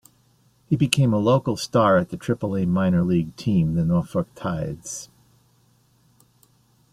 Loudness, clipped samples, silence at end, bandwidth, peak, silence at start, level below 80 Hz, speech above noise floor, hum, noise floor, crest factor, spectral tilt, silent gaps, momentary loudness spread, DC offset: -22 LUFS; under 0.1%; 1.9 s; 14.5 kHz; 0 dBFS; 0.7 s; -52 dBFS; 39 dB; none; -60 dBFS; 24 dB; -6.5 dB/octave; none; 10 LU; under 0.1%